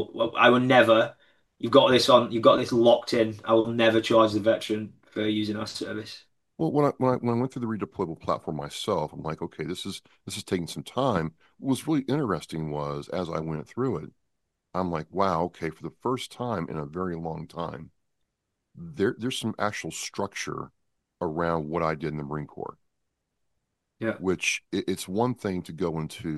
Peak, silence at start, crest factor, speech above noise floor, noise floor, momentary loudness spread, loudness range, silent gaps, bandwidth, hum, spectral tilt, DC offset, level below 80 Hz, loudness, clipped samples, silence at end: -4 dBFS; 0 s; 22 dB; 55 dB; -81 dBFS; 15 LU; 11 LU; none; 12.5 kHz; none; -5 dB/octave; under 0.1%; -58 dBFS; -26 LUFS; under 0.1%; 0 s